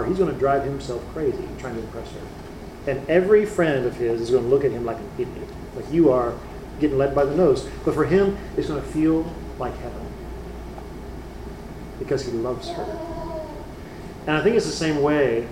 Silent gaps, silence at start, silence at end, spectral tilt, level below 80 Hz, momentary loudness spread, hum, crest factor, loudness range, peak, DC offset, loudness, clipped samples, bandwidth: none; 0 s; 0 s; -6.5 dB/octave; -40 dBFS; 18 LU; none; 18 dB; 9 LU; -4 dBFS; under 0.1%; -23 LUFS; under 0.1%; 15.5 kHz